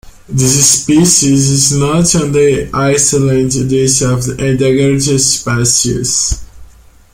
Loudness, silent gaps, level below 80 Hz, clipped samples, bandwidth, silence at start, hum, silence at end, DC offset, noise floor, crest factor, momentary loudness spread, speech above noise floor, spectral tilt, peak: -10 LUFS; none; -32 dBFS; under 0.1%; 16.5 kHz; 0.05 s; none; 0.5 s; under 0.1%; -39 dBFS; 12 dB; 6 LU; 29 dB; -4 dB/octave; 0 dBFS